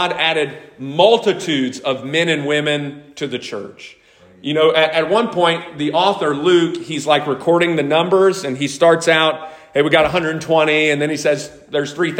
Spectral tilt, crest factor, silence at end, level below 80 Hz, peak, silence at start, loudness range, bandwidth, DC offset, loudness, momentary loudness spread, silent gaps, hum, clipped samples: -4.5 dB/octave; 16 dB; 0 s; -56 dBFS; 0 dBFS; 0 s; 4 LU; 16 kHz; under 0.1%; -16 LUFS; 12 LU; none; none; under 0.1%